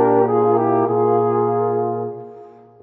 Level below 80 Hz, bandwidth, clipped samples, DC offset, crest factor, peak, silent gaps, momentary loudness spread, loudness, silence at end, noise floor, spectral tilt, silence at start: -74 dBFS; 3.1 kHz; under 0.1%; under 0.1%; 14 dB; -4 dBFS; none; 13 LU; -18 LUFS; 0.3 s; -41 dBFS; -13 dB/octave; 0 s